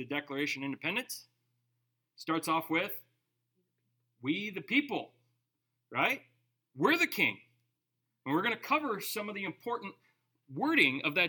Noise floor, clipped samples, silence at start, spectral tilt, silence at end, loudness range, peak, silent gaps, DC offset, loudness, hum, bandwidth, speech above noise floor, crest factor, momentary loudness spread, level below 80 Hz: -85 dBFS; under 0.1%; 0 s; -4 dB/octave; 0 s; 5 LU; -12 dBFS; none; under 0.1%; -32 LUFS; 60 Hz at -70 dBFS; 19 kHz; 52 dB; 24 dB; 16 LU; -90 dBFS